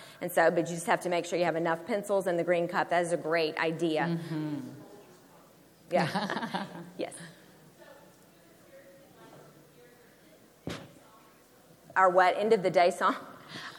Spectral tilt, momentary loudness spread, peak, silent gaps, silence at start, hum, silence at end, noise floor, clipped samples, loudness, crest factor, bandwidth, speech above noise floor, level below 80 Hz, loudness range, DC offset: -5 dB/octave; 17 LU; -10 dBFS; none; 0 s; none; 0 s; -58 dBFS; under 0.1%; -29 LUFS; 22 dB; 19.5 kHz; 30 dB; -74 dBFS; 21 LU; under 0.1%